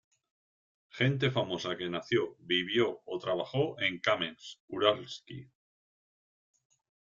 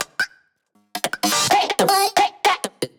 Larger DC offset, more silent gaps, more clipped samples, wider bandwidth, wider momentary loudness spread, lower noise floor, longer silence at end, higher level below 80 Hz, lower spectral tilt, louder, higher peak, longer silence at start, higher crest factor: neither; first, 4.60-4.68 s vs none; neither; second, 7.6 kHz vs over 20 kHz; first, 15 LU vs 10 LU; first, under -90 dBFS vs -64 dBFS; first, 1.65 s vs 0.1 s; second, -72 dBFS vs -64 dBFS; first, -5.5 dB/octave vs -1.5 dB/octave; second, -31 LUFS vs -19 LUFS; second, -10 dBFS vs -4 dBFS; first, 0.95 s vs 0 s; first, 24 dB vs 16 dB